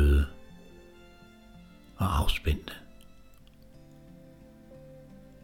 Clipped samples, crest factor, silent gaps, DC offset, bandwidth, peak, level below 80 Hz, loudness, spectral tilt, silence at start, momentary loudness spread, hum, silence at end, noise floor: under 0.1%; 20 dB; none; under 0.1%; 16 kHz; -12 dBFS; -34 dBFS; -30 LUFS; -6 dB/octave; 0 s; 26 LU; none; 2.65 s; -53 dBFS